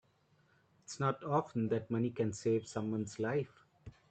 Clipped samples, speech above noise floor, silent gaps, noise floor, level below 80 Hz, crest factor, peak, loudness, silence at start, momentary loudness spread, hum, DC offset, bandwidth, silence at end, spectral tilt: under 0.1%; 36 dB; none; -71 dBFS; -72 dBFS; 18 dB; -18 dBFS; -36 LUFS; 0.9 s; 5 LU; none; under 0.1%; 9 kHz; 0.2 s; -6.5 dB/octave